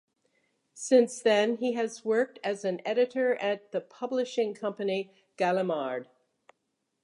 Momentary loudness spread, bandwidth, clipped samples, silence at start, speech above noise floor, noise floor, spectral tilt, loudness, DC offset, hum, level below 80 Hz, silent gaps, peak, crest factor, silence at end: 11 LU; 11.5 kHz; under 0.1%; 0.75 s; 52 dB; -80 dBFS; -4.5 dB/octave; -29 LUFS; under 0.1%; none; -86 dBFS; none; -10 dBFS; 20 dB; 1 s